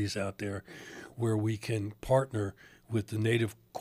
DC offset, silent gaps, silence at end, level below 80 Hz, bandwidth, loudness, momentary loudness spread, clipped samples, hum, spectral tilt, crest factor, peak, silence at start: under 0.1%; none; 0 s; -58 dBFS; 15.5 kHz; -33 LUFS; 12 LU; under 0.1%; none; -6.5 dB/octave; 20 dB; -14 dBFS; 0 s